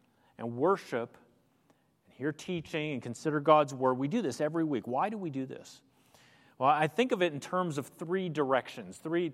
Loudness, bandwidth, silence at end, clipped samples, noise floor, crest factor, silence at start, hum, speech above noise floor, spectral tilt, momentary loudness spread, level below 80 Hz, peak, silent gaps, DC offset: -31 LUFS; 15.5 kHz; 0 s; under 0.1%; -69 dBFS; 22 dB; 0.4 s; none; 38 dB; -6 dB/octave; 13 LU; -78 dBFS; -10 dBFS; none; under 0.1%